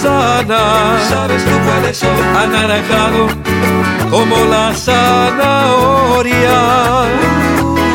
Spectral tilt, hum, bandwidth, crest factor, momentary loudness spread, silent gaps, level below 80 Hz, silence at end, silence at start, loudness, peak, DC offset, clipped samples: -5 dB/octave; none; 17 kHz; 10 dB; 3 LU; none; -30 dBFS; 0 s; 0 s; -11 LUFS; 0 dBFS; under 0.1%; under 0.1%